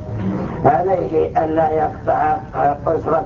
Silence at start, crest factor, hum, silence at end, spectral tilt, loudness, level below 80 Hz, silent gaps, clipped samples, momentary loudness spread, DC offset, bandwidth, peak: 0 s; 18 dB; none; 0 s; -9.5 dB/octave; -18 LUFS; -38 dBFS; none; under 0.1%; 5 LU; under 0.1%; 7 kHz; 0 dBFS